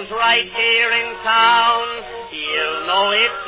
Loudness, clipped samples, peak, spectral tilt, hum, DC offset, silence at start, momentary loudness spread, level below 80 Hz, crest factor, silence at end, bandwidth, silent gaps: -16 LUFS; under 0.1%; -4 dBFS; -4.5 dB/octave; none; under 0.1%; 0 s; 13 LU; -54 dBFS; 14 dB; 0 s; 4 kHz; none